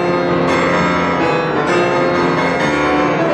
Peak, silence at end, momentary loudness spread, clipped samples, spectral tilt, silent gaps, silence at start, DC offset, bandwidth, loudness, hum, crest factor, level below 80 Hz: -2 dBFS; 0 s; 1 LU; under 0.1%; -6 dB/octave; none; 0 s; under 0.1%; 10.5 kHz; -14 LUFS; none; 12 dB; -44 dBFS